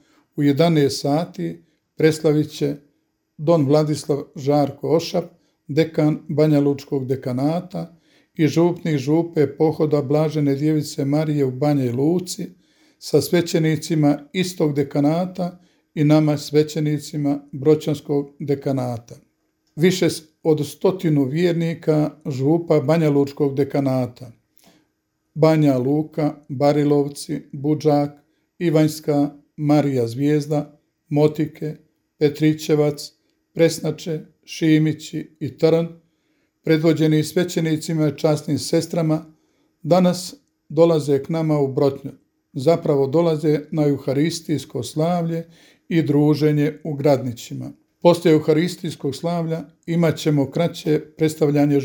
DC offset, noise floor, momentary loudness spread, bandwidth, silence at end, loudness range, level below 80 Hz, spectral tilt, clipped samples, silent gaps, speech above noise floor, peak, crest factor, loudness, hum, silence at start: under 0.1%; -71 dBFS; 12 LU; 19.5 kHz; 0 s; 2 LU; -64 dBFS; -7 dB/octave; under 0.1%; none; 52 dB; 0 dBFS; 20 dB; -20 LUFS; none; 0.35 s